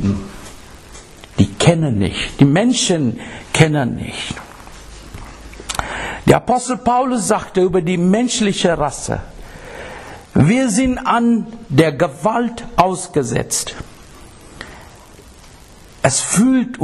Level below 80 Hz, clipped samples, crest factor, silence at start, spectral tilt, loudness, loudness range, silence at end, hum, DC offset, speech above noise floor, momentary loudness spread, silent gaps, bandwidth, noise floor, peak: -38 dBFS; under 0.1%; 18 dB; 0 s; -5 dB/octave; -16 LUFS; 5 LU; 0 s; none; under 0.1%; 26 dB; 22 LU; none; 13 kHz; -41 dBFS; 0 dBFS